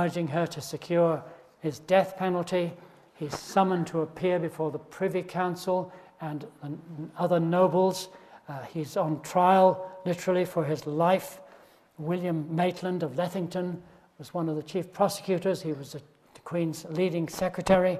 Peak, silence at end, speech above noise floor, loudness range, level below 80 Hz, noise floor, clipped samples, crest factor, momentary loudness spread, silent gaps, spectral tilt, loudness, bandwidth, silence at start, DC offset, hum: -8 dBFS; 0 s; 28 dB; 6 LU; -64 dBFS; -56 dBFS; under 0.1%; 22 dB; 16 LU; none; -6.5 dB/octave; -28 LUFS; 14 kHz; 0 s; under 0.1%; none